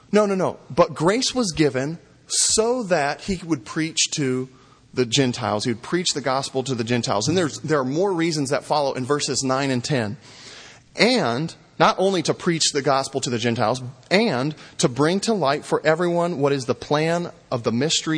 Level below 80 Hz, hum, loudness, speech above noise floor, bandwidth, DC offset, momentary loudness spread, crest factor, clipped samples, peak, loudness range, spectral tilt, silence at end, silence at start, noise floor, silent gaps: -54 dBFS; none; -21 LUFS; 22 dB; 10.5 kHz; under 0.1%; 9 LU; 22 dB; under 0.1%; 0 dBFS; 2 LU; -4 dB/octave; 0 s; 0.1 s; -44 dBFS; none